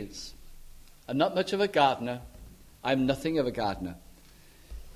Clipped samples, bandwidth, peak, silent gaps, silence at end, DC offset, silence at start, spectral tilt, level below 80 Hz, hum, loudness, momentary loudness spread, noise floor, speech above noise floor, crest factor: under 0.1%; 16 kHz; -10 dBFS; none; 0.05 s; under 0.1%; 0 s; -5.5 dB/octave; -52 dBFS; none; -29 LUFS; 24 LU; -54 dBFS; 26 dB; 22 dB